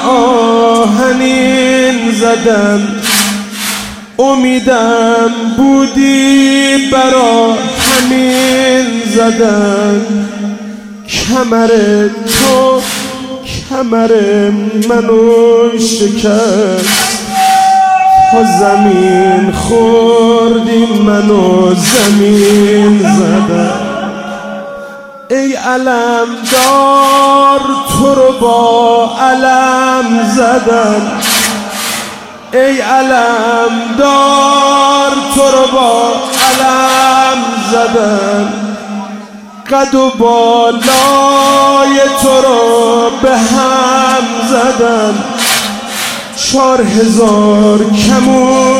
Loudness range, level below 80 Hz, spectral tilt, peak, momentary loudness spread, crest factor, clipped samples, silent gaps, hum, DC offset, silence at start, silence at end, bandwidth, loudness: 3 LU; -40 dBFS; -4 dB/octave; 0 dBFS; 9 LU; 8 dB; 0.4%; none; none; under 0.1%; 0 s; 0 s; 16.5 kHz; -8 LUFS